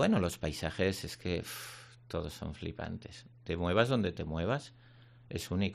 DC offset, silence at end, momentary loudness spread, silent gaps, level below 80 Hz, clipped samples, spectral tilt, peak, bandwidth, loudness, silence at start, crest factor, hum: under 0.1%; 0 s; 16 LU; none; -56 dBFS; under 0.1%; -5.5 dB/octave; -14 dBFS; 14 kHz; -35 LUFS; 0 s; 22 dB; none